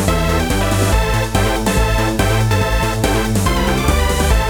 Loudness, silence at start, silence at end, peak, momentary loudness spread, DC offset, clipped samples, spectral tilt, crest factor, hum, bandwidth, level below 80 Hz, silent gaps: -16 LUFS; 0 s; 0 s; -2 dBFS; 1 LU; under 0.1%; under 0.1%; -5 dB/octave; 14 dB; none; over 20 kHz; -20 dBFS; none